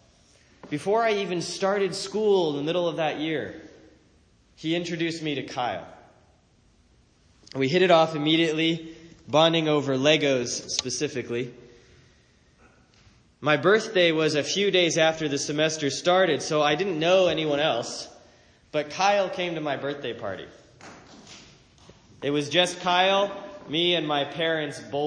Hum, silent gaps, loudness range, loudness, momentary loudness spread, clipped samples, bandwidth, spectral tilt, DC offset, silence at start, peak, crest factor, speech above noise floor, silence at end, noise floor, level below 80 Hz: none; none; 9 LU; -24 LUFS; 12 LU; under 0.1%; 10.5 kHz; -4 dB/octave; under 0.1%; 0.65 s; -4 dBFS; 22 dB; 37 dB; 0 s; -61 dBFS; -64 dBFS